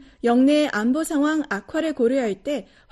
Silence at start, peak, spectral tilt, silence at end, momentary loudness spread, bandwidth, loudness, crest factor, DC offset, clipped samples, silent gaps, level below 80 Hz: 0.25 s; -8 dBFS; -4.5 dB/octave; 0.3 s; 10 LU; 12.5 kHz; -22 LUFS; 14 dB; under 0.1%; under 0.1%; none; -56 dBFS